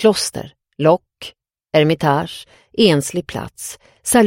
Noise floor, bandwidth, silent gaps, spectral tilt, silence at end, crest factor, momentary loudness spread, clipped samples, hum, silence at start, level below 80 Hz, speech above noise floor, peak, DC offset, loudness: -39 dBFS; 16.5 kHz; none; -4.5 dB/octave; 0 s; 18 dB; 20 LU; under 0.1%; none; 0 s; -52 dBFS; 22 dB; 0 dBFS; under 0.1%; -18 LUFS